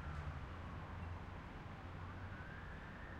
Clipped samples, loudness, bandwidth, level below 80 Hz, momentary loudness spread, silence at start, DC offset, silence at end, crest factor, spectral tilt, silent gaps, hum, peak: under 0.1%; -51 LUFS; 9.2 kHz; -56 dBFS; 3 LU; 0 s; under 0.1%; 0 s; 14 dB; -7 dB/octave; none; none; -34 dBFS